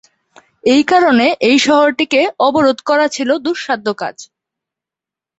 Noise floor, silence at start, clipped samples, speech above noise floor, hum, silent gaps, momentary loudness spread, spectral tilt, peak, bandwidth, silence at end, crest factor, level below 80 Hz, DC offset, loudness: -87 dBFS; 0.65 s; under 0.1%; 74 dB; none; none; 9 LU; -3.5 dB/octave; 0 dBFS; 8.2 kHz; 1.15 s; 14 dB; -58 dBFS; under 0.1%; -13 LUFS